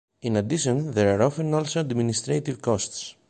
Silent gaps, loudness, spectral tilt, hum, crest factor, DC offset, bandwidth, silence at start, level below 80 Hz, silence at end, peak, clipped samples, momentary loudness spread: none; -24 LUFS; -5.5 dB/octave; none; 18 dB; under 0.1%; 9.2 kHz; 0.25 s; -54 dBFS; 0.2 s; -6 dBFS; under 0.1%; 5 LU